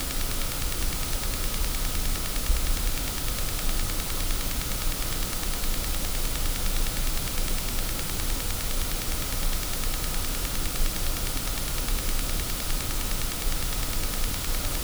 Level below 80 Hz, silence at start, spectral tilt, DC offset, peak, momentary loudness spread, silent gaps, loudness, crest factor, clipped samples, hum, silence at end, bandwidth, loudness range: -28 dBFS; 0 s; -2.5 dB/octave; under 0.1%; -8 dBFS; 1 LU; none; -29 LUFS; 18 dB; under 0.1%; none; 0 s; over 20 kHz; 0 LU